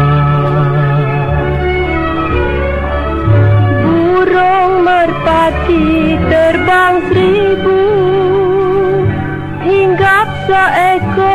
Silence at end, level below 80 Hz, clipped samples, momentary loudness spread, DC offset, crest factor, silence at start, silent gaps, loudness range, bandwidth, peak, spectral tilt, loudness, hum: 0 s; -24 dBFS; under 0.1%; 5 LU; 1%; 10 dB; 0 s; none; 2 LU; 13 kHz; 0 dBFS; -8 dB/octave; -11 LUFS; none